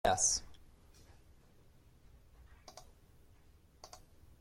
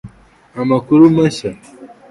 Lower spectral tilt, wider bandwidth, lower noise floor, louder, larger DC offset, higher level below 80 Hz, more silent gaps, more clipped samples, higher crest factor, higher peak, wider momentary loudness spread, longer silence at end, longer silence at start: second, -1 dB/octave vs -7.5 dB/octave; first, 16.5 kHz vs 11.5 kHz; first, -63 dBFS vs -39 dBFS; second, -32 LUFS vs -13 LUFS; neither; second, -60 dBFS vs -48 dBFS; neither; neither; first, 24 dB vs 14 dB; second, -18 dBFS vs 0 dBFS; first, 29 LU vs 17 LU; first, 0.55 s vs 0.25 s; about the same, 0.05 s vs 0.05 s